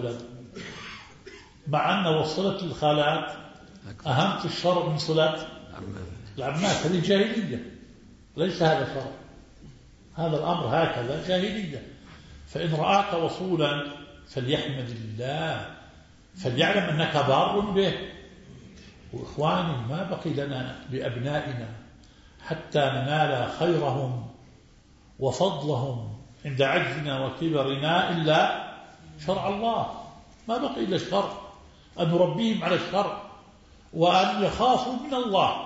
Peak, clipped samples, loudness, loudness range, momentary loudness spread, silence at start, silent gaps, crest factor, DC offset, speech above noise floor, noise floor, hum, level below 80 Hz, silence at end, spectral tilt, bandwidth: -8 dBFS; under 0.1%; -26 LUFS; 4 LU; 18 LU; 0 s; none; 20 dB; under 0.1%; 29 dB; -55 dBFS; none; -54 dBFS; 0 s; -5.5 dB/octave; 8 kHz